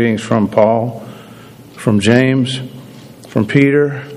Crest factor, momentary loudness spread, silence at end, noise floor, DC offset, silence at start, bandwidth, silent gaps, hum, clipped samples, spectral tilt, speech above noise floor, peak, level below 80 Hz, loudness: 14 dB; 19 LU; 0 s; -37 dBFS; under 0.1%; 0 s; 14.5 kHz; none; none; 0.1%; -6.5 dB/octave; 24 dB; 0 dBFS; -54 dBFS; -14 LUFS